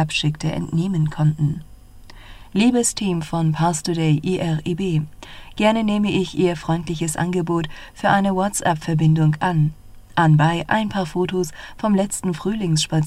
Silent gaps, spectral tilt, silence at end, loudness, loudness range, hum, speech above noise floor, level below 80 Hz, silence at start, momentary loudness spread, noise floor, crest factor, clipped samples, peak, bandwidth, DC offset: none; -5.5 dB/octave; 0 s; -20 LUFS; 2 LU; none; 22 dB; -44 dBFS; 0 s; 8 LU; -41 dBFS; 18 dB; under 0.1%; -2 dBFS; 13.5 kHz; under 0.1%